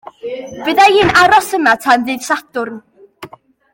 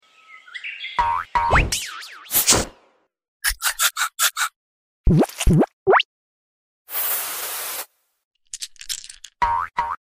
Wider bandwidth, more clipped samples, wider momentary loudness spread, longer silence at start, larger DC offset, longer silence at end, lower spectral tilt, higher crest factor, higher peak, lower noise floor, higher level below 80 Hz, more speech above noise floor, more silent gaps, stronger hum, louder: about the same, 17 kHz vs 16 kHz; neither; first, 17 LU vs 14 LU; about the same, 0.25 s vs 0.3 s; neither; first, 0.45 s vs 0.1 s; about the same, -3.5 dB/octave vs -3 dB/octave; second, 14 dB vs 20 dB; about the same, 0 dBFS vs -2 dBFS; second, -37 dBFS vs -61 dBFS; second, -46 dBFS vs -32 dBFS; second, 24 dB vs 39 dB; second, none vs 3.28-3.40 s, 4.56-5.04 s, 5.73-5.86 s, 6.05-6.85 s, 8.24-8.31 s; neither; first, -12 LUFS vs -21 LUFS